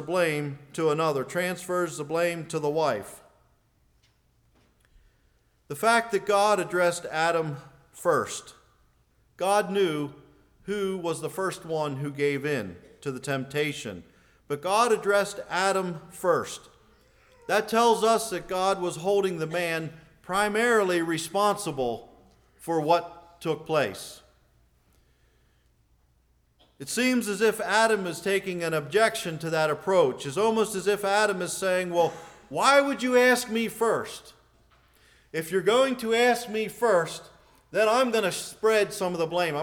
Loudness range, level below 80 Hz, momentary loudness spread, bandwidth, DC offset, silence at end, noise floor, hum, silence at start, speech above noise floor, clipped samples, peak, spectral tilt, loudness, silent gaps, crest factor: 6 LU; -64 dBFS; 13 LU; 20 kHz; under 0.1%; 0 s; -66 dBFS; none; 0 s; 40 dB; under 0.1%; -6 dBFS; -4 dB/octave; -26 LUFS; none; 20 dB